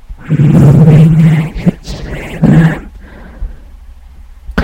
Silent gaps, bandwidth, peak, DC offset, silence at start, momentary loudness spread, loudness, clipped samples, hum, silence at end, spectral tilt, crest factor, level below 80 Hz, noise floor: none; 8.8 kHz; 0 dBFS; under 0.1%; 0.1 s; 23 LU; -8 LUFS; 3%; none; 0 s; -9 dB/octave; 10 dB; -26 dBFS; -33 dBFS